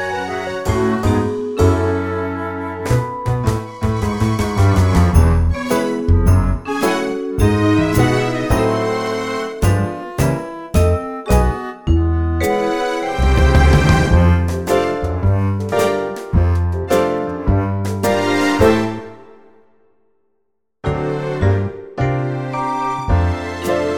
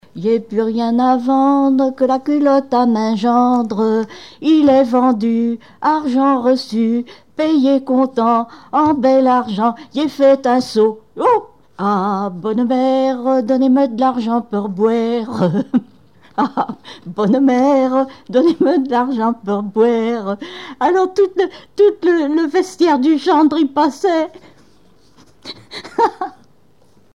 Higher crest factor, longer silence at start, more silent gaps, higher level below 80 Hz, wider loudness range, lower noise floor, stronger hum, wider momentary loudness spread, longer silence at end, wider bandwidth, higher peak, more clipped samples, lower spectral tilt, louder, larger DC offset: about the same, 16 dB vs 12 dB; second, 0 s vs 0.15 s; neither; first, -24 dBFS vs -60 dBFS; about the same, 5 LU vs 3 LU; first, -71 dBFS vs -54 dBFS; neither; about the same, 9 LU vs 8 LU; second, 0 s vs 0.85 s; first, 19.5 kHz vs 10.5 kHz; about the same, 0 dBFS vs -2 dBFS; neither; about the same, -6.5 dB/octave vs -6.5 dB/octave; about the same, -17 LUFS vs -15 LUFS; about the same, 0.2% vs 0.3%